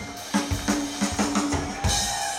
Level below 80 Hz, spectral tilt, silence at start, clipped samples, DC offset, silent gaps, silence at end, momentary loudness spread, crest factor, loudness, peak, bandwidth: -38 dBFS; -3.5 dB/octave; 0 s; under 0.1%; under 0.1%; none; 0 s; 4 LU; 16 dB; -25 LUFS; -10 dBFS; 16.5 kHz